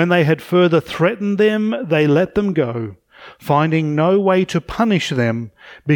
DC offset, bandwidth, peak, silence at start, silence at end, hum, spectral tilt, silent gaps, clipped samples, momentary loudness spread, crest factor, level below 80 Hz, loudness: under 0.1%; 18 kHz; -2 dBFS; 0 s; 0 s; none; -7 dB/octave; none; under 0.1%; 11 LU; 14 dB; -48 dBFS; -17 LUFS